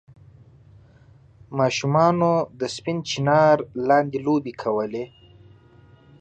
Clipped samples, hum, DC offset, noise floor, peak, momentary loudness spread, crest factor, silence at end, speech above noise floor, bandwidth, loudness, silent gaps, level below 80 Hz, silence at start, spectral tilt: under 0.1%; none; under 0.1%; -52 dBFS; -4 dBFS; 11 LU; 18 dB; 1.15 s; 31 dB; 9 kHz; -22 LUFS; none; -60 dBFS; 1.5 s; -6 dB/octave